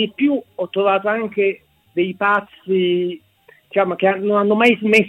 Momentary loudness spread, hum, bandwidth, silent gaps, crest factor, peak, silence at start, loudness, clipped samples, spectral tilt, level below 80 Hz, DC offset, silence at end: 10 LU; none; 12 kHz; none; 18 dB; 0 dBFS; 0 s; -18 LUFS; under 0.1%; -6 dB/octave; -64 dBFS; under 0.1%; 0 s